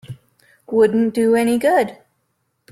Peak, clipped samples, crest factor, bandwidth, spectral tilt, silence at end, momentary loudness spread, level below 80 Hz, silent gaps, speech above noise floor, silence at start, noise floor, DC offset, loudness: -4 dBFS; under 0.1%; 14 dB; 14.5 kHz; -6 dB/octave; 0.8 s; 9 LU; -60 dBFS; none; 54 dB; 0.1 s; -69 dBFS; under 0.1%; -17 LUFS